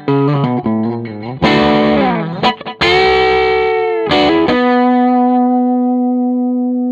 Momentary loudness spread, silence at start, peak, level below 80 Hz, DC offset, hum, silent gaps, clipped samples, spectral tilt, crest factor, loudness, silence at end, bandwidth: 5 LU; 0 s; 0 dBFS; -40 dBFS; under 0.1%; none; none; under 0.1%; -7 dB/octave; 12 dB; -13 LUFS; 0 s; 7.8 kHz